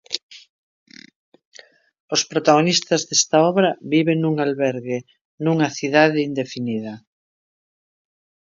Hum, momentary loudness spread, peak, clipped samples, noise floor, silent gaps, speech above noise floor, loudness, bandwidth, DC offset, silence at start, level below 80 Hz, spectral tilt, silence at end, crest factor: none; 13 LU; 0 dBFS; under 0.1%; under -90 dBFS; 0.23-0.29 s, 0.49-0.86 s, 1.16-1.32 s, 1.46-1.52 s, 2.00-2.08 s, 5.21-5.38 s; over 71 dB; -19 LUFS; 7.6 kHz; under 0.1%; 0.1 s; -70 dBFS; -4 dB/octave; 1.5 s; 20 dB